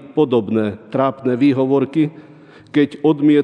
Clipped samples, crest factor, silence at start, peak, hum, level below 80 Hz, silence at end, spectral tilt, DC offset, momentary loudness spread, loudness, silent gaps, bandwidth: under 0.1%; 14 dB; 0 s; -2 dBFS; none; -66 dBFS; 0 s; -9 dB/octave; under 0.1%; 6 LU; -17 LUFS; none; 5.2 kHz